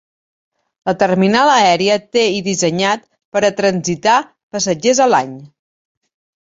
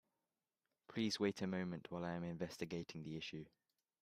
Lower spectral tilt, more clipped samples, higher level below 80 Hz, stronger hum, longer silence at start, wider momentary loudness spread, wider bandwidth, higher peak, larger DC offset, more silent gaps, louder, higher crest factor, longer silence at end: second, -4 dB/octave vs -5.5 dB/octave; neither; first, -58 dBFS vs -78 dBFS; neither; about the same, 0.85 s vs 0.9 s; about the same, 11 LU vs 11 LU; second, 8 kHz vs 14.5 kHz; first, 0 dBFS vs -26 dBFS; neither; first, 3.25-3.32 s, 4.43-4.51 s vs none; first, -15 LUFS vs -45 LUFS; about the same, 16 dB vs 20 dB; first, 1.05 s vs 0.55 s